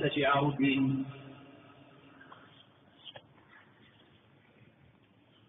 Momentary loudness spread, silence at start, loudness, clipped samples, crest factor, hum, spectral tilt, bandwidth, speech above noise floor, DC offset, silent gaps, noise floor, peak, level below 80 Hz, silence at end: 27 LU; 0 s; -30 LUFS; under 0.1%; 20 dB; none; -4 dB/octave; 3.9 kHz; 35 dB; under 0.1%; none; -64 dBFS; -16 dBFS; -70 dBFS; 2.3 s